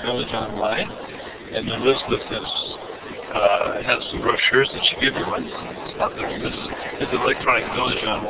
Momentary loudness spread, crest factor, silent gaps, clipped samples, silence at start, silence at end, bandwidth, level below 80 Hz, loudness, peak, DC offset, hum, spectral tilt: 13 LU; 18 dB; none; under 0.1%; 0 s; 0 s; 4 kHz; -46 dBFS; -22 LUFS; -4 dBFS; under 0.1%; none; -8 dB/octave